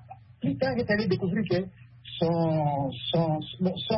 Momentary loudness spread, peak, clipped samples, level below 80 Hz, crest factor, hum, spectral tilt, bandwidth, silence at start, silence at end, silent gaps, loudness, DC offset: 7 LU; -14 dBFS; under 0.1%; -56 dBFS; 14 dB; none; -10.5 dB/octave; 5.8 kHz; 0 s; 0 s; none; -28 LUFS; under 0.1%